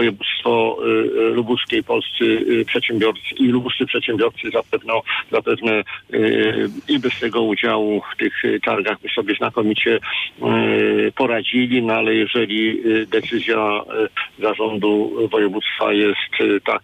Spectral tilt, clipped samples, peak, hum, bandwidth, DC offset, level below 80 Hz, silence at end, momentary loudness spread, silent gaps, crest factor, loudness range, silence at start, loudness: -6.5 dB/octave; under 0.1%; -6 dBFS; none; 9 kHz; under 0.1%; -60 dBFS; 0.05 s; 4 LU; none; 12 dB; 2 LU; 0 s; -18 LUFS